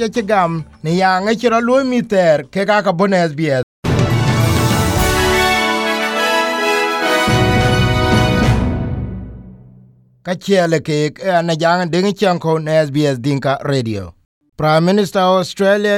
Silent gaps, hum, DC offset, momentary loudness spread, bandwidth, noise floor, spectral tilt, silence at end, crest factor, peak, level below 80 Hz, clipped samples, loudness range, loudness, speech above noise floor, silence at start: 3.63-3.83 s, 14.25-14.41 s; none; under 0.1%; 6 LU; 18 kHz; -46 dBFS; -5.5 dB/octave; 0 s; 14 dB; -2 dBFS; -32 dBFS; under 0.1%; 3 LU; -15 LUFS; 32 dB; 0 s